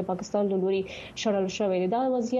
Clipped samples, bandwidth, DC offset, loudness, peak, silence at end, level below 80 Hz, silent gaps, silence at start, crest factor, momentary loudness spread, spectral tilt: under 0.1%; 7.8 kHz; under 0.1%; -27 LUFS; -14 dBFS; 0 s; -62 dBFS; none; 0 s; 14 dB; 5 LU; -5.5 dB/octave